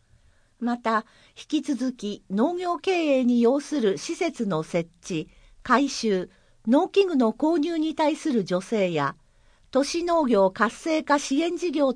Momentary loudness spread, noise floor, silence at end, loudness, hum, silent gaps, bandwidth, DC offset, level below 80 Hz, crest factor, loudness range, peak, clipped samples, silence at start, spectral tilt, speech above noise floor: 9 LU; -59 dBFS; 0 s; -24 LUFS; none; none; 10.5 kHz; under 0.1%; -60 dBFS; 20 dB; 2 LU; -6 dBFS; under 0.1%; 0.6 s; -5 dB/octave; 35 dB